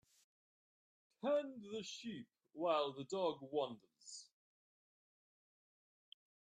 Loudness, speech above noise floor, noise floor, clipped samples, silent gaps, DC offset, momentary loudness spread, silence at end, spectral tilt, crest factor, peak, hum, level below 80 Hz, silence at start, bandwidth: -42 LUFS; over 48 dB; under -90 dBFS; under 0.1%; none; under 0.1%; 16 LU; 2.3 s; -4 dB/octave; 22 dB; -24 dBFS; none; under -90 dBFS; 1.25 s; 10.5 kHz